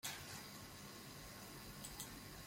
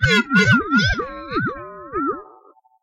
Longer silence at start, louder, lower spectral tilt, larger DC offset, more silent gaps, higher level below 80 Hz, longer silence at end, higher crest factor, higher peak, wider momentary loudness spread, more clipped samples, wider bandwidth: about the same, 0.05 s vs 0 s; second, -52 LUFS vs -19 LUFS; second, -2.5 dB/octave vs -5 dB/octave; neither; neither; second, -66 dBFS vs -38 dBFS; second, 0 s vs 0.6 s; first, 22 dB vs 16 dB; second, -30 dBFS vs -4 dBFS; second, 4 LU vs 14 LU; neither; first, 16.5 kHz vs 14 kHz